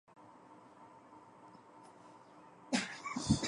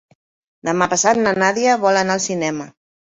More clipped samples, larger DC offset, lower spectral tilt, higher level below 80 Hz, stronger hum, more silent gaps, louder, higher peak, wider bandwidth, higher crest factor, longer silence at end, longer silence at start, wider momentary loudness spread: neither; neither; about the same, -4 dB/octave vs -3.5 dB/octave; about the same, -60 dBFS vs -58 dBFS; neither; neither; second, -38 LUFS vs -17 LUFS; second, -18 dBFS vs -2 dBFS; first, 11.5 kHz vs 8.4 kHz; first, 24 dB vs 18 dB; second, 0 s vs 0.35 s; second, 0.15 s vs 0.65 s; first, 22 LU vs 12 LU